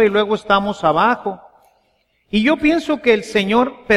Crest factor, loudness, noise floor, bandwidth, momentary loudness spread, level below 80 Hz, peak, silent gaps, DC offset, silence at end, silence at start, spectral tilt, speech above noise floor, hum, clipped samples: 16 dB; -16 LUFS; -63 dBFS; 12 kHz; 7 LU; -46 dBFS; -2 dBFS; none; under 0.1%; 0 s; 0 s; -5.5 dB/octave; 47 dB; none; under 0.1%